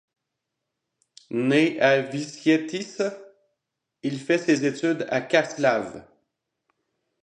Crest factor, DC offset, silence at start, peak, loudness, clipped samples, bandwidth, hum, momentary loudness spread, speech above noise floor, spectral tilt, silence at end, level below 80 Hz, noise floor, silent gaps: 20 dB; under 0.1%; 1.3 s; -6 dBFS; -24 LUFS; under 0.1%; 10 kHz; none; 11 LU; 59 dB; -5 dB/octave; 1.2 s; -72 dBFS; -82 dBFS; none